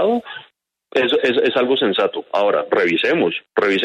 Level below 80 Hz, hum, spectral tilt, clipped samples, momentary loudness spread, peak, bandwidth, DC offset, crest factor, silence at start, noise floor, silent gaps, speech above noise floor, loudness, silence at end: -66 dBFS; none; -5.5 dB/octave; under 0.1%; 7 LU; -4 dBFS; 8.6 kHz; under 0.1%; 14 dB; 0 s; -48 dBFS; none; 31 dB; -18 LUFS; 0 s